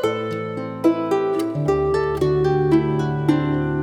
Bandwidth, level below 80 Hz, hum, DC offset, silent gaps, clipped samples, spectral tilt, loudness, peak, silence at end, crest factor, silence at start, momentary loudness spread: 16 kHz; -42 dBFS; none; under 0.1%; none; under 0.1%; -8 dB/octave; -20 LUFS; -6 dBFS; 0 s; 14 dB; 0 s; 6 LU